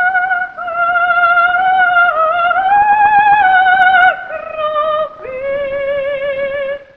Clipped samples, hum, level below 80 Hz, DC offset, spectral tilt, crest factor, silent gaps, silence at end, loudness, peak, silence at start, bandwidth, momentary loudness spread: under 0.1%; none; -50 dBFS; 0.1%; -4.5 dB/octave; 12 dB; none; 0.15 s; -12 LUFS; 0 dBFS; 0 s; 4.7 kHz; 11 LU